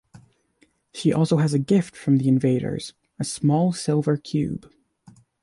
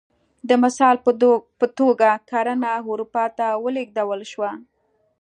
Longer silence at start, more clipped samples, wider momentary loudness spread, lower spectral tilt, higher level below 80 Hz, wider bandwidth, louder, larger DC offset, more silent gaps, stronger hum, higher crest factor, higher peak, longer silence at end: second, 0.15 s vs 0.45 s; neither; about the same, 12 LU vs 11 LU; first, -7 dB/octave vs -4.5 dB/octave; first, -56 dBFS vs -72 dBFS; first, 11.5 kHz vs 9.6 kHz; about the same, -22 LUFS vs -20 LUFS; neither; neither; neither; about the same, 16 dB vs 18 dB; second, -8 dBFS vs -2 dBFS; first, 0.85 s vs 0.6 s